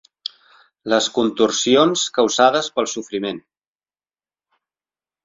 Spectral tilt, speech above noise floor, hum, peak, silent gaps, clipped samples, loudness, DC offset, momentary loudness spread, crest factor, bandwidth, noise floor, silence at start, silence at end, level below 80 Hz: -3 dB/octave; over 72 dB; none; -2 dBFS; none; under 0.1%; -18 LUFS; under 0.1%; 17 LU; 20 dB; 7.8 kHz; under -90 dBFS; 0.85 s; 1.85 s; -62 dBFS